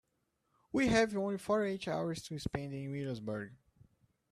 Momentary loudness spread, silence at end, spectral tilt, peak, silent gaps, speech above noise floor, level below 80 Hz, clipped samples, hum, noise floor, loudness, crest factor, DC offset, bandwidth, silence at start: 11 LU; 0.8 s; -5.5 dB/octave; -16 dBFS; none; 46 dB; -60 dBFS; under 0.1%; none; -81 dBFS; -36 LUFS; 20 dB; under 0.1%; 13.5 kHz; 0.75 s